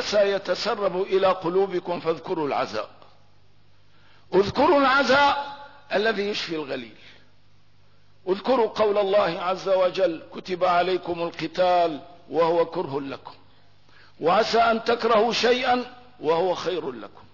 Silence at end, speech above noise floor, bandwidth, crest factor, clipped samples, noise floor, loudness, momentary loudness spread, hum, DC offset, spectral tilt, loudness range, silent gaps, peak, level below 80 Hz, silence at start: 0.25 s; 37 dB; 6 kHz; 14 dB; under 0.1%; -60 dBFS; -23 LUFS; 14 LU; 50 Hz at -60 dBFS; 0.3%; -4.5 dB/octave; 4 LU; none; -10 dBFS; -60 dBFS; 0 s